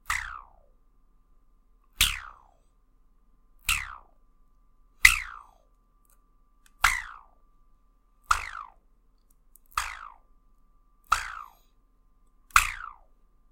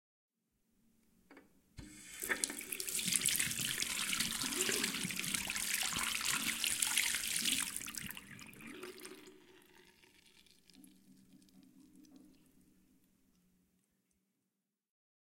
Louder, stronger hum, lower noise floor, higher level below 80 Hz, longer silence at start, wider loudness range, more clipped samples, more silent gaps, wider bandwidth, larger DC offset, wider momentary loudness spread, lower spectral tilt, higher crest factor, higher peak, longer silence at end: first, -26 LUFS vs -35 LUFS; neither; second, -63 dBFS vs -88 dBFS; first, -46 dBFS vs -70 dBFS; second, 0.1 s vs 1.3 s; second, 9 LU vs 17 LU; neither; neither; about the same, 16.5 kHz vs 17 kHz; neither; first, 27 LU vs 19 LU; about the same, 1 dB/octave vs 0 dB/octave; about the same, 32 dB vs 32 dB; first, 0 dBFS vs -10 dBFS; second, 0.6 s vs 3.1 s